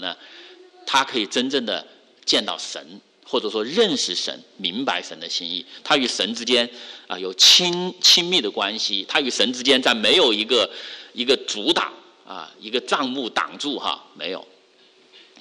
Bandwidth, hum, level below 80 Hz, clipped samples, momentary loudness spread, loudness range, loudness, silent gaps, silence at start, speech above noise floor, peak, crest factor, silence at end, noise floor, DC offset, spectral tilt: 11.5 kHz; none; -66 dBFS; under 0.1%; 16 LU; 7 LU; -20 LUFS; none; 0 s; 33 dB; -4 dBFS; 18 dB; 0.2 s; -55 dBFS; under 0.1%; -1.5 dB/octave